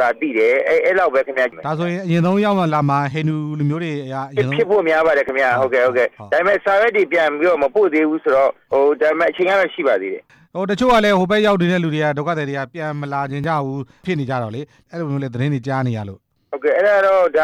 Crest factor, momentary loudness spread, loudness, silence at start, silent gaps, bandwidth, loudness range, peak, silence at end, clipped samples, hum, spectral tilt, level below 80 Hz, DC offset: 10 dB; 10 LU; -17 LUFS; 0 s; none; 13.5 kHz; 7 LU; -6 dBFS; 0 s; under 0.1%; none; -7 dB/octave; -52 dBFS; under 0.1%